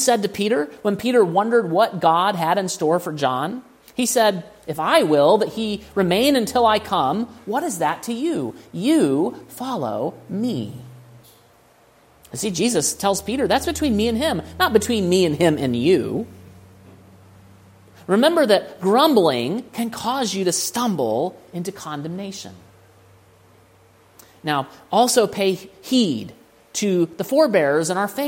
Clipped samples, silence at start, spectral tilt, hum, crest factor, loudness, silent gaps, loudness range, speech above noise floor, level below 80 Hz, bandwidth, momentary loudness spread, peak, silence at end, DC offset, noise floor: under 0.1%; 0 s; -4 dB/octave; none; 18 dB; -20 LUFS; none; 7 LU; 34 dB; -52 dBFS; 16.5 kHz; 13 LU; -2 dBFS; 0 s; under 0.1%; -54 dBFS